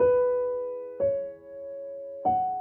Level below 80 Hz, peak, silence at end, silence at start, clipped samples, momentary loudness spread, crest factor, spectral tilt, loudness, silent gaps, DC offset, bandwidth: -60 dBFS; -14 dBFS; 0 s; 0 s; under 0.1%; 14 LU; 14 dB; -10 dB/octave; -29 LUFS; none; under 0.1%; 3.2 kHz